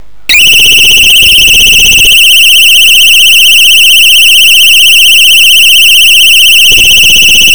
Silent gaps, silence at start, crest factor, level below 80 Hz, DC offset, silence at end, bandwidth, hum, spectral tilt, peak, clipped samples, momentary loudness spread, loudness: none; 0.3 s; 2 dB; -28 dBFS; 10%; 0 s; over 20 kHz; none; 2 dB/octave; 0 dBFS; 10%; 0 LU; 1 LUFS